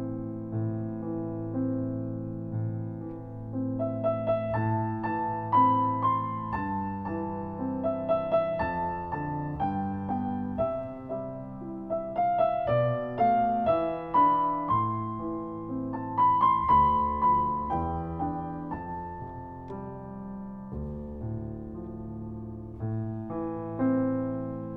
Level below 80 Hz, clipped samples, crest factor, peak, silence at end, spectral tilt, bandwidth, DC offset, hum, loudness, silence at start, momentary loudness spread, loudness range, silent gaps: -50 dBFS; under 0.1%; 16 dB; -12 dBFS; 0 s; -11 dB/octave; 4.8 kHz; under 0.1%; none; -29 LUFS; 0 s; 15 LU; 11 LU; none